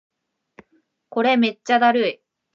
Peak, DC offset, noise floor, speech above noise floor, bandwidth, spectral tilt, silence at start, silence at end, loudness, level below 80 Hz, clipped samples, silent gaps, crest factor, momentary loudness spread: -6 dBFS; under 0.1%; -65 dBFS; 47 dB; 7.4 kHz; -4.5 dB/octave; 1.15 s; 0.4 s; -19 LUFS; -78 dBFS; under 0.1%; none; 16 dB; 11 LU